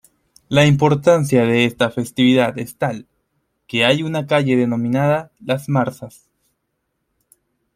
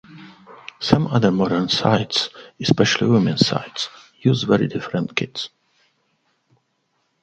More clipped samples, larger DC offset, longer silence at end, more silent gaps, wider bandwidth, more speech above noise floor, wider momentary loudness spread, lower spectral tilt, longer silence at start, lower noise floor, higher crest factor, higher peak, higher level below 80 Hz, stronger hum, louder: neither; neither; about the same, 1.65 s vs 1.75 s; neither; first, 15.5 kHz vs 8.8 kHz; first, 56 dB vs 50 dB; about the same, 10 LU vs 12 LU; about the same, -6 dB/octave vs -5.5 dB/octave; first, 0.5 s vs 0.1 s; first, -73 dBFS vs -69 dBFS; about the same, 16 dB vs 20 dB; about the same, -2 dBFS vs 0 dBFS; about the same, -54 dBFS vs -52 dBFS; neither; first, -17 LUFS vs -20 LUFS